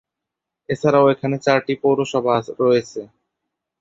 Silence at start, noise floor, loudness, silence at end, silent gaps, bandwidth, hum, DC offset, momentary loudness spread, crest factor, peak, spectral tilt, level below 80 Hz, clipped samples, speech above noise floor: 0.7 s; -83 dBFS; -18 LUFS; 0.75 s; none; 7.8 kHz; none; under 0.1%; 10 LU; 18 dB; -2 dBFS; -6.5 dB/octave; -60 dBFS; under 0.1%; 65 dB